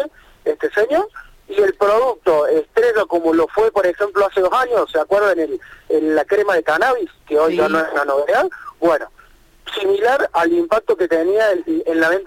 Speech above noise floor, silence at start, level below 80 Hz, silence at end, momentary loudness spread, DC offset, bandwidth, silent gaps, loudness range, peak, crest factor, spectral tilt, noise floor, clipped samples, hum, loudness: 31 dB; 0 s; -52 dBFS; 0 s; 7 LU; under 0.1%; 16.5 kHz; none; 2 LU; -4 dBFS; 14 dB; -4.5 dB/octave; -48 dBFS; under 0.1%; none; -17 LUFS